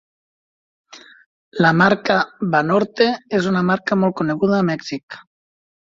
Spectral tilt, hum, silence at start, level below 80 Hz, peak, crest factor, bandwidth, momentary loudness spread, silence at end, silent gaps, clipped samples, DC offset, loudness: -6.5 dB/octave; none; 0.95 s; -60 dBFS; 0 dBFS; 20 dB; 7.6 kHz; 15 LU; 0.75 s; 1.26-1.52 s, 5.03-5.08 s; under 0.1%; under 0.1%; -18 LUFS